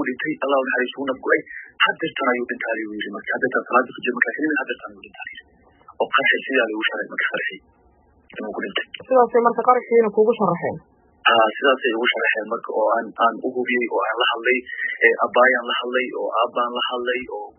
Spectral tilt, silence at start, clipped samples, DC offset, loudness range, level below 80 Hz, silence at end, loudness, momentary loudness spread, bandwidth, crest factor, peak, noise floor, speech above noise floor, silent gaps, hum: 1.5 dB/octave; 0 s; under 0.1%; under 0.1%; 4 LU; -68 dBFS; 0.1 s; -20 LUFS; 12 LU; 3.4 kHz; 20 dB; -2 dBFS; -56 dBFS; 36 dB; none; none